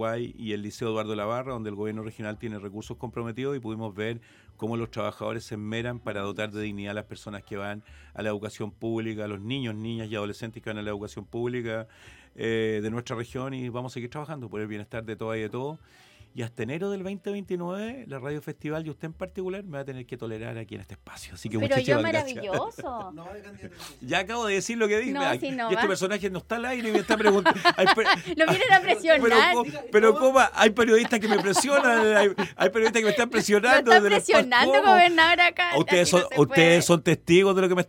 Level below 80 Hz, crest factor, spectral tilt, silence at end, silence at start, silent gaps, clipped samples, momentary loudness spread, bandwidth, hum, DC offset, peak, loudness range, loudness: -58 dBFS; 20 dB; -4 dB/octave; 0.05 s; 0 s; none; under 0.1%; 18 LU; 17 kHz; none; under 0.1%; -4 dBFS; 15 LU; -23 LUFS